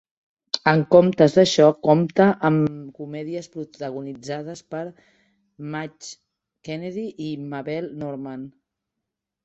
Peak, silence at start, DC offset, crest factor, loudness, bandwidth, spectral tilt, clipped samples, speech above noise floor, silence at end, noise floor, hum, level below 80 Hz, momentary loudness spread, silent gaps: -2 dBFS; 0.55 s; under 0.1%; 22 dB; -21 LUFS; 8.2 kHz; -6 dB/octave; under 0.1%; 62 dB; 0.95 s; -83 dBFS; none; -64 dBFS; 20 LU; none